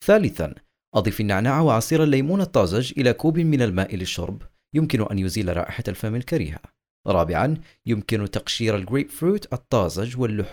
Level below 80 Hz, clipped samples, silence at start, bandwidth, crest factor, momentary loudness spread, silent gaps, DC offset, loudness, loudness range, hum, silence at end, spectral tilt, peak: -44 dBFS; under 0.1%; 0 s; over 20 kHz; 18 dB; 9 LU; 0.87-0.92 s, 6.90-7.04 s; under 0.1%; -23 LUFS; 5 LU; none; 0 s; -6 dB/octave; -4 dBFS